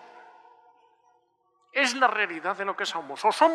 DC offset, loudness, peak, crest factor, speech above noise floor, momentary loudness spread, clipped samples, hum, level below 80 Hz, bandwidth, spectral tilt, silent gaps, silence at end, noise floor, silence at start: under 0.1%; -26 LUFS; -8 dBFS; 20 dB; 44 dB; 9 LU; under 0.1%; none; under -90 dBFS; 13.5 kHz; -1.5 dB/octave; none; 0 s; -69 dBFS; 0 s